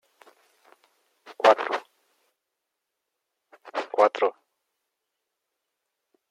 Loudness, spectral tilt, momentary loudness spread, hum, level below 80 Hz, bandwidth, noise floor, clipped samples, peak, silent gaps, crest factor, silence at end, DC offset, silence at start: -24 LUFS; -2.5 dB/octave; 13 LU; none; under -90 dBFS; 12 kHz; -83 dBFS; under 0.1%; -4 dBFS; none; 26 dB; 2 s; under 0.1%; 1.25 s